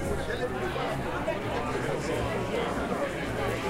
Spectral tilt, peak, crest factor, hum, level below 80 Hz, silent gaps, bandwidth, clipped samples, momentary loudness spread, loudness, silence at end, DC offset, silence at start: -5.5 dB/octave; -16 dBFS; 14 dB; none; -44 dBFS; none; 16 kHz; under 0.1%; 1 LU; -31 LUFS; 0 s; under 0.1%; 0 s